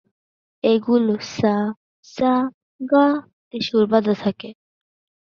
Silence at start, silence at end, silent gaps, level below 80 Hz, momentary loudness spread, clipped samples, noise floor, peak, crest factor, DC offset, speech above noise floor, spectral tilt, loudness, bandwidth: 0.65 s; 0.8 s; 1.77-2.03 s, 2.54-2.79 s, 3.33-3.51 s; -60 dBFS; 17 LU; under 0.1%; under -90 dBFS; -2 dBFS; 18 dB; under 0.1%; over 71 dB; -6.5 dB/octave; -20 LUFS; 7 kHz